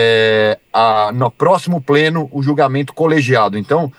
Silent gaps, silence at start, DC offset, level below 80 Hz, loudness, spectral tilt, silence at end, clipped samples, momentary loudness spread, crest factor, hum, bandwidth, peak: none; 0 s; under 0.1%; -62 dBFS; -14 LUFS; -6.5 dB/octave; 0.05 s; under 0.1%; 4 LU; 12 dB; none; 12.5 kHz; 0 dBFS